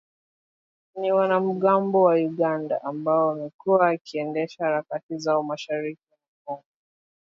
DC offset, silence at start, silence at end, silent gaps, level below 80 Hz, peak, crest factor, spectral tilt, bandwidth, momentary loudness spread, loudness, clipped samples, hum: under 0.1%; 0.95 s; 0.8 s; 3.54-3.59 s, 4.01-4.05 s, 5.03-5.09 s, 6.28-6.45 s; -78 dBFS; -6 dBFS; 18 dB; -7 dB/octave; 7.4 kHz; 13 LU; -24 LUFS; under 0.1%; none